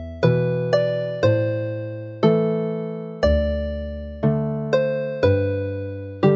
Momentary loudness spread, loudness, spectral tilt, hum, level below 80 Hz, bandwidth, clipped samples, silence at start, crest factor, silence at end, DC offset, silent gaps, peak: 10 LU; -22 LUFS; -8.5 dB/octave; none; -34 dBFS; 7.2 kHz; under 0.1%; 0 s; 18 dB; 0 s; under 0.1%; none; -4 dBFS